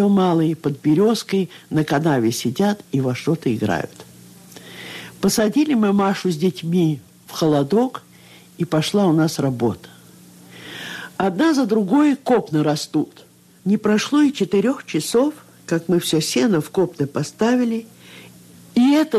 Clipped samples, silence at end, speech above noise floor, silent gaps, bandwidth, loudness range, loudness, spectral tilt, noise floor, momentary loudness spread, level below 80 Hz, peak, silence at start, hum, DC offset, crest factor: under 0.1%; 0 s; 28 dB; none; 14.5 kHz; 3 LU; -19 LUFS; -6 dB/octave; -46 dBFS; 14 LU; -60 dBFS; -8 dBFS; 0 s; none; under 0.1%; 12 dB